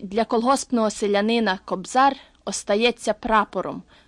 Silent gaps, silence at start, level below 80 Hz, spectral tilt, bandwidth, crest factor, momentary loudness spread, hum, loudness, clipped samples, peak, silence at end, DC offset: none; 0 s; -52 dBFS; -3.5 dB/octave; 12 kHz; 18 dB; 10 LU; none; -22 LUFS; under 0.1%; -6 dBFS; 0.25 s; under 0.1%